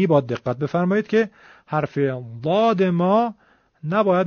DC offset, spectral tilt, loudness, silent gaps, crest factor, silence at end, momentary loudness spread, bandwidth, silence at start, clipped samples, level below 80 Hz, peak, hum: under 0.1%; -6.5 dB/octave; -21 LUFS; none; 16 dB; 0 s; 9 LU; 6.8 kHz; 0 s; under 0.1%; -62 dBFS; -4 dBFS; none